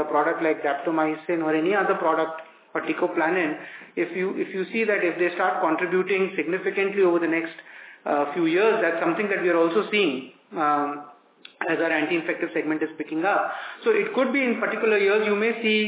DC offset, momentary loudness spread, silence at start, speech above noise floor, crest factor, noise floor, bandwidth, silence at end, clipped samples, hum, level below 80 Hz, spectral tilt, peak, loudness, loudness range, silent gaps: under 0.1%; 9 LU; 0 s; 27 dB; 16 dB; -50 dBFS; 4 kHz; 0 s; under 0.1%; none; -86 dBFS; -9 dB/octave; -8 dBFS; -23 LUFS; 3 LU; none